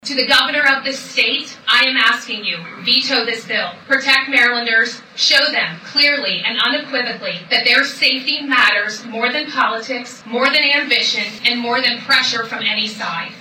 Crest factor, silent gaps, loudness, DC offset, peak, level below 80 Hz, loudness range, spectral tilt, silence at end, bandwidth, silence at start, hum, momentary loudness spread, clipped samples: 14 dB; none; -15 LUFS; under 0.1%; -4 dBFS; -64 dBFS; 1 LU; -1.5 dB/octave; 0 s; 17 kHz; 0.05 s; none; 9 LU; under 0.1%